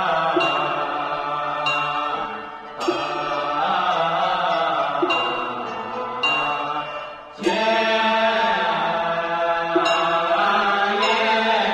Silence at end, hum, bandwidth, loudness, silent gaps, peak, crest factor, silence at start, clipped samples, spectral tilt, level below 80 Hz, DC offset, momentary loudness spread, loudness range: 0 s; none; 10.5 kHz; -21 LUFS; none; -6 dBFS; 14 dB; 0 s; under 0.1%; -3.5 dB/octave; -58 dBFS; under 0.1%; 9 LU; 3 LU